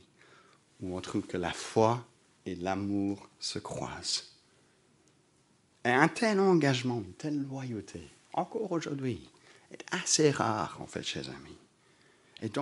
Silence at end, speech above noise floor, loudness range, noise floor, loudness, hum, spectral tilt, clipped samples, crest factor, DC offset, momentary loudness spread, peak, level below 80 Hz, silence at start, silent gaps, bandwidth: 0 s; 36 dB; 6 LU; -67 dBFS; -32 LUFS; none; -4.5 dB/octave; under 0.1%; 26 dB; under 0.1%; 16 LU; -6 dBFS; -66 dBFS; 0.8 s; none; 11.5 kHz